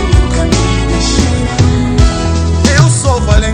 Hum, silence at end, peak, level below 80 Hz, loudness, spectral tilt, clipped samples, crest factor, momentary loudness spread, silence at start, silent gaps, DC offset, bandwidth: none; 0 s; 0 dBFS; -14 dBFS; -11 LUFS; -5 dB/octave; 1%; 10 dB; 4 LU; 0 s; none; under 0.1%; 10.5 kHz